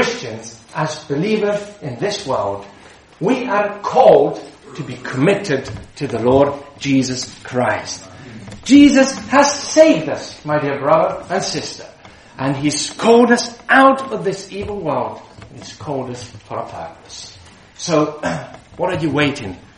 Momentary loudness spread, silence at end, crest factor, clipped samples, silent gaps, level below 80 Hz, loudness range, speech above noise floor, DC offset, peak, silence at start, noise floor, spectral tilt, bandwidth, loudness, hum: 20 LU; 0.2 s; 18 dB; under 0.1%; none; -50 dBFS; 10 LU; 25 dB; under 0.1%; 0 dBFS; 0 s; -42 dBFS; -4.5 dB/octave; 11 kHz; -16 LUFS; none